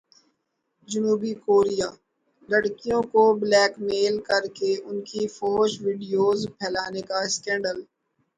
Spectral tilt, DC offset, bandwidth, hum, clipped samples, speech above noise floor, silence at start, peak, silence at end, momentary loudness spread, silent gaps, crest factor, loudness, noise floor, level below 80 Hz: -3.5 dB/octave; under 0.1%; 9.4 kHz; none; under 0.1%; 53 dB; 0.9 s; -6 dBFS; 0.55 s; 10 LU; none; 18 dB; -24 LUFS; -76 dBFS; -62 dBFS